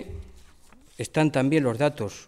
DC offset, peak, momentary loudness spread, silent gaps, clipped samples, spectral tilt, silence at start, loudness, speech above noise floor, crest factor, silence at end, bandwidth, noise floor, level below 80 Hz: under 0.1%; -10 dBFS; 18 LU; none; under 0.1%; -6.5 dB/octave; 0 s; -24 LUFS; 28 dB; 16 dB; 0.05 s; 14 kHz; -52 dBFS; -50 dBFS